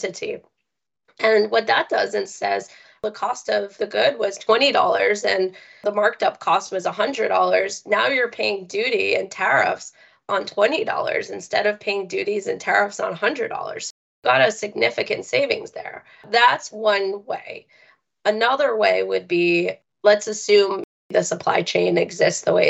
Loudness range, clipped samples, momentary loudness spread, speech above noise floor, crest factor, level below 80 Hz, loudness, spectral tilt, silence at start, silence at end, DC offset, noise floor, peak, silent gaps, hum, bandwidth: 3 LU; under 0.1%; 11 LU; 60 dB; 18 dB; -70 dBFS; -21 LUFS; -3 dB/octave; 0 s; 0 s; under 0.1%; -81 dBFS; -2 dBFS; 13.90-14.22 s, 20.84-21.10 s; none; 8.4 kHz